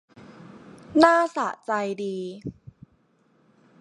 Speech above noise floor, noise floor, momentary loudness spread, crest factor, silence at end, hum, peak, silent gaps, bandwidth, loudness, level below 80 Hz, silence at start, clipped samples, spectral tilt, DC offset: 41 dB; -64 dBFS; 18 LU; 24 dB; 1.3 s; none; -2 dBFS; none; 10.5 kHz; -23 LUFS; -62 dBFS; 0.3 s; under 0.1%; -5 dB/octave; under 0.1%